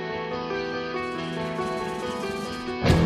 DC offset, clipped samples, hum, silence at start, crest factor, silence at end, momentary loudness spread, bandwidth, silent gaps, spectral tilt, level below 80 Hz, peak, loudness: under 0.1%; under 0.1%; none; 0 s; 18 dB; 0 s; 3 LU; 14.5 kHz; none; -6 dB/octave; -42 dBFS; -8 dBFS; -29 LUFS